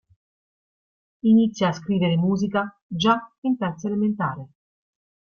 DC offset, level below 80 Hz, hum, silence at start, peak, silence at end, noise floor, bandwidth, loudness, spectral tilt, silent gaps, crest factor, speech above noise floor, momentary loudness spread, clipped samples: under 0.1%; -60 dBFS; none; 1.25 s; -6 dBFS; 0.9 s; under -90 dBFS; 7 kHz; -23 LUFS; -7 dB/octave; 2.82-2.90 s, 3.38-3.42 s; 18 dB; over 68 dB; 9 LU; under 0.1%